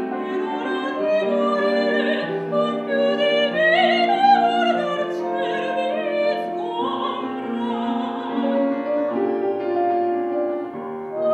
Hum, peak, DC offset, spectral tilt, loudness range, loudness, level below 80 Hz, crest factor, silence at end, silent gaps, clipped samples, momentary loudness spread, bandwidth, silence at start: none; -4 dBFS; under 0.1%; -5.5 dB/octave; 5 LU; -21 LUFS; -78 dBFS; 16 dB; 0 s; none; under 0.1%; 9 LU; 8.6 kHz; 0 s